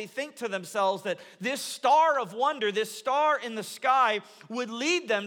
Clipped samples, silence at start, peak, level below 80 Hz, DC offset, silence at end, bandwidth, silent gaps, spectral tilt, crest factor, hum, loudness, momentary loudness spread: under 0.1%; 0 s; -12 dBFS; -90 dBFS; under 0.1%; 0 s; 19 kHz; none; -2.5 dB/octave; 16 dB; none; -27 LUFS; 12 LU